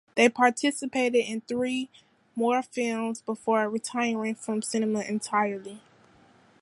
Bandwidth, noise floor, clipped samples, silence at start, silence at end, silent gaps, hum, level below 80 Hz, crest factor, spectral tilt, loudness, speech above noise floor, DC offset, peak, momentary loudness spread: 11.5 kHz; -58 dBFS; under 0.1%; 0.15 s; 0.85 s; none; none; -76 dBFS; 22 dB; -3.5 dB/octave; -27 LUFS; 32 dB; under 0.1%; -6 dBFS; 9 LU